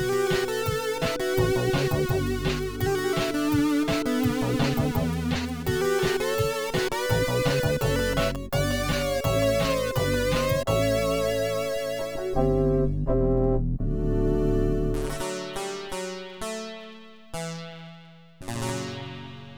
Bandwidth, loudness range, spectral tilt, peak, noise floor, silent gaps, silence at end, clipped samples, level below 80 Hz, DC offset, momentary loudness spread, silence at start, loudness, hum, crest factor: over 20 kHz; 8 LU; -5.5 dB/octave; -10 dBFS; -48 dBFS; none; 0 s; under 0.1%; -36 dBFS; 0.3%; 11 LU; 0 s; -26 LUFS; none; 16 dB